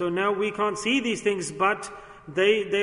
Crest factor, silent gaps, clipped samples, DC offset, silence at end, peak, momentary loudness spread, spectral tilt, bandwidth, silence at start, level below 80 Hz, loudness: 18 dB; none; under 0.1%; under 0.1%; 0 s; -8 dBFS; 10 LU; -3.5 dB/octave; 11 kHz; 0 s; -60 dBFS; -25 LUFS